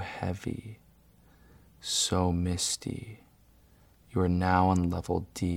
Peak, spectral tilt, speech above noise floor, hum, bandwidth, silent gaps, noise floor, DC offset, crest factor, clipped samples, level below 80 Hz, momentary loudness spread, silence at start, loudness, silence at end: -8 dBFS; -4.5 dB/octave; 31 dB; none; 16 kHz; none; -60 dBFS; under 0.1%; 22 dB; under 0.1%; -50 dBFS; 17 LU; 0 s; -29 LUFS; 0 s